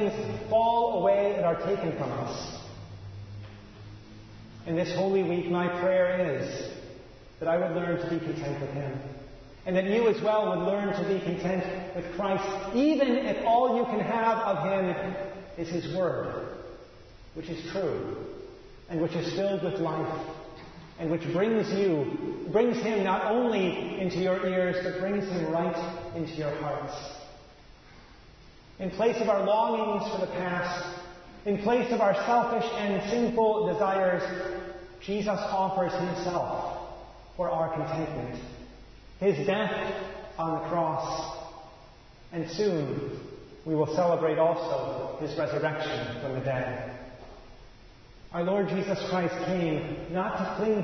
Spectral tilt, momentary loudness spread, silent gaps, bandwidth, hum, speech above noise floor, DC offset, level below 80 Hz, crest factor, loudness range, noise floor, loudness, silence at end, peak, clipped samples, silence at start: -6.5 dB/octave; 18 LU; none; 6.4 kHz; none; 24 dB; under 0.1%; -54 dBFS; 18 dB; 6 LU; -52 dBFS; -29 LUFS; 0 s; -12 dBFS; under 0.1%; 0 s